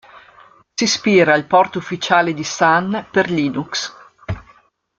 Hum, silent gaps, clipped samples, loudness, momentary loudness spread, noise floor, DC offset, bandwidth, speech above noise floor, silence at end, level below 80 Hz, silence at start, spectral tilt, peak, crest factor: none; none; under 0.1%; -16 LUFS; 17 LU; -53 dBFS; under 0.1%; 9 kHz; 36 dB; 0.6 s; -50 dBFS; 0.15 s; -4 dB/octave; 0 dBFS; 18 dB